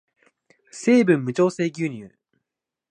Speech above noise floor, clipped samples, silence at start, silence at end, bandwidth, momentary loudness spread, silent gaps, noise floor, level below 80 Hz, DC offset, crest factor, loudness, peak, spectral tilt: 64 dB; under 0.1%; 0.75 s; 0.85 s; 9.8 kHz; 17 LU; none; -84 dBFS; -72 dBFS; under 0.1%; 18 dB; -21 LUFS; -6 dBFS; -6.5 dB/octave